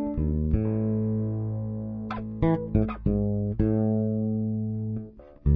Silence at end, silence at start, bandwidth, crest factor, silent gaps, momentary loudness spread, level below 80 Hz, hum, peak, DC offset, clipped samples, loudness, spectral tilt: 0 s; 0 s; 4.6 kHz; 16 dB; none; 9 LU; -34 dBFS; none; -10 dBFS; under 0.1%; under 0.1%; -28 LUFS; -12.5 dB/octave